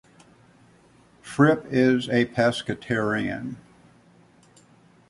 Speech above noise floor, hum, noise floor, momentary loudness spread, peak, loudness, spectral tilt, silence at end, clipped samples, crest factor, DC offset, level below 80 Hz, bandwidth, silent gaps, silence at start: 34 dB; none; -56 dBFS; 14 LU; -4 dBFS; -23 LUFS; -6.5 dB/octave; 1.5 s; under 0.1%; 22 dB; under 0.1%; -60 dBFS; 11.5 kHz; none; 1.25 s